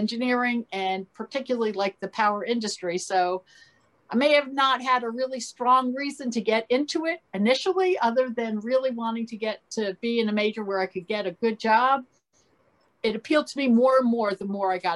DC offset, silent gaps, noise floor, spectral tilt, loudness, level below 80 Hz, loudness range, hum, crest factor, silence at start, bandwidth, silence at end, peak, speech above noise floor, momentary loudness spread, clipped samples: under 0.1%; none; -65 dBFS; -4.5 dB/octave; -25 LUFS; -74 dBFS; 3 LU; none; 18 dB; 0 s; 11.5 kHz; 0 s; -8 dBFS; 41 dB; 9 LU; under 0.1%